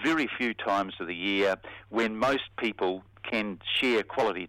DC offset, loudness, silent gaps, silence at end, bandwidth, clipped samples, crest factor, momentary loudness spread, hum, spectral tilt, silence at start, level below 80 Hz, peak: under 0.1%; -29 LUFS; none; 0 s; 16 kHz; under 0.1%; 16 dB; 6 LU; none; -4.5 dB/octave; 0 s; -62 dBFS; -14 dBFS